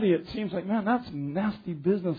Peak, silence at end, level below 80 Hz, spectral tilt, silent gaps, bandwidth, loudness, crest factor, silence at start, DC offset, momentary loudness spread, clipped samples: -14 dBFS; 0 s; -58 dBFS; -9.5 dB/octave; none; 5 kHz; -29 LUFS; 14 dB; 0 s; under 0.1%; 6 LU; under 0.1%